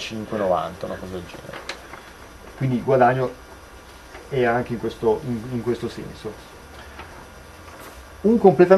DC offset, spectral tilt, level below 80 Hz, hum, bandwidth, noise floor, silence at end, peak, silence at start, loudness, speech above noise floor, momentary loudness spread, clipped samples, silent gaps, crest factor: under 0.1%; -7 dB/octave; -48 dBFS; none; 14 kHz; -43 dBFS; 0 s; 0 dBFS; 0 s; -23 LUFS; 22 dB; 24 LU; under 0.1%; none; 22 dB